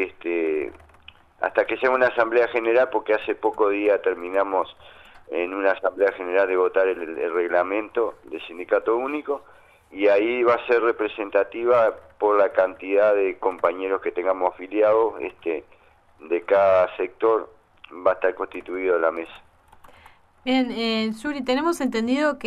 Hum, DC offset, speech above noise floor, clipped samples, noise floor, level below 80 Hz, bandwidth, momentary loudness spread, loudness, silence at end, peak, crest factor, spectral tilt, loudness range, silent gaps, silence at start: none; under 0.1%; 32 dB; under 0.1%; -54 dBFS; -60 dBFS; 12.5 kHz; 9 LU; -22 LUFS; 0 s; -6 dBFS; 16 dB; -5 dB/octave; 4 LU; none; 0 s